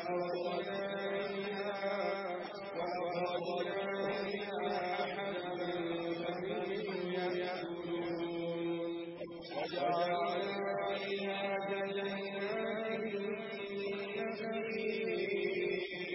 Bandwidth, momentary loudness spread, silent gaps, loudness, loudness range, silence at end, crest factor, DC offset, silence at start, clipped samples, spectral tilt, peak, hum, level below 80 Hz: 5.8 kHz; 4 LU; none; -38 LUFS; 2 LU; 0 s; 16 dB; under 0.1%; 0 s; under 0.1%; -8.5 dB/octave; -22 dBFS; none; -76 dBFS